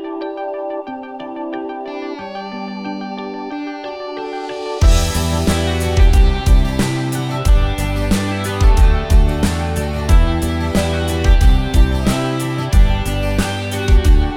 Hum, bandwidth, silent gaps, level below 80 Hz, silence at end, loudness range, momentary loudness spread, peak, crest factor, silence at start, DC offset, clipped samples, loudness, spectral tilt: none; 15.5 kHz; none; -16 dBFS; 0 s; 10 LU; 12 LU; -2 dBFS; 14 dB; 0 s; under 0.1%; under 0.1%; -18 LUFS; -5.5 dB/octave